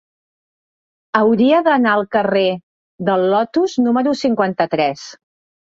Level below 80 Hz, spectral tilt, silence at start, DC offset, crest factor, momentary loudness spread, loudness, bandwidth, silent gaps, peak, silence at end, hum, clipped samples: -62 dBFS; -6 dB/octave; 1.15 s; under 0.1%; 16 dB; 8 LU; -16 LUFS; 7.6 kHz; 2.63-2.99 s; -2 dBFS; 0.65 s; none; under 0.1%